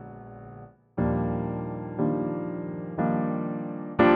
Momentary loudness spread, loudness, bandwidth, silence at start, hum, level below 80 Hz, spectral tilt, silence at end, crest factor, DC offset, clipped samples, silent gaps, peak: 17 LU; -29 LUFS; 4.9 kHz; 0 s; none; -48 dBFS; -7 dB/octave; 0 s; 20 dB; under 0.1%; under 0.1%; none; -8 dBFS